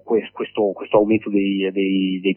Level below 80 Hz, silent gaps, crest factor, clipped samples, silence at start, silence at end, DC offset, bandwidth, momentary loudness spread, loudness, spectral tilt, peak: -60 dBFS; none; 18 dB; under 0.1%; 0.05 s; 0 s; under 0.1%; 3.3 kHz; 5 LU; -20 LUFS; -11 dB/octave; -2 dBFS